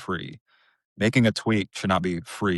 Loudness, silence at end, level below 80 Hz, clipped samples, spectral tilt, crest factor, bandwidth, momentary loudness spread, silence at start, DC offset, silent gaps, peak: -24 LUFS; 0 s; -56 dBFS; under 0.1%; -6 dB/octave; 18 dB; 12 kHz; 11 LU; 0 s; under 0.1%; 0.41-0.46 s, 0.85-0.96 s; -8 dBFS